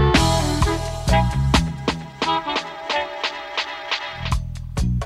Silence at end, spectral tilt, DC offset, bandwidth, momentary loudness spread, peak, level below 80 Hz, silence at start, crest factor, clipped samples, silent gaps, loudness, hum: 0 s; -5 dB/octave; under 0.1%; 15 kHz; 7 LU; -2 dBFS; -28 dBFS; 0 s; 18 dB; under 0.1%; none; -22 LUFS; none